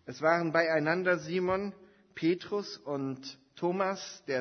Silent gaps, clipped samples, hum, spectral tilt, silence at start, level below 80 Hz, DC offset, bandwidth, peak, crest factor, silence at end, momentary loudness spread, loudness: none; under 0.1%; none; -5.5 dB/octave; 0.05 s; -70 dBFS; under 0.1%; 6.6 kHz; -12 dBFS; 18 dB; 0 s; 12 LU; -31 LUFS